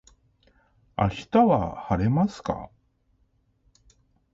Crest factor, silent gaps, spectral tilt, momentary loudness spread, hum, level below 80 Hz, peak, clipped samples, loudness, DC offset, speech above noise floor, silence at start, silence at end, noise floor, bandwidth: 18 dB; none; -8 dB/octave; 15 LU; none; -46 dBFS; -8 dBFS; under 0.1%; -24 LUFS; under 0.1%; 44 dB; 1 s; 1.7 s; -67 dBFS; 7.8 kHz